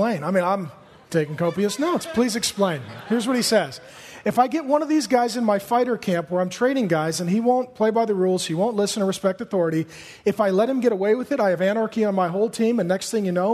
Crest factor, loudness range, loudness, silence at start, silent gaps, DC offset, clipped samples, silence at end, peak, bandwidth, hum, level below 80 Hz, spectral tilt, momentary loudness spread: 18 dB; 1 LU; -22 LUFS; 0 s; none; under 0.1%; under 0.1%; 0 s; -4 dBFS; 13.5 kHz; none; -64 dBFS; -5 dB/octave; 5 LU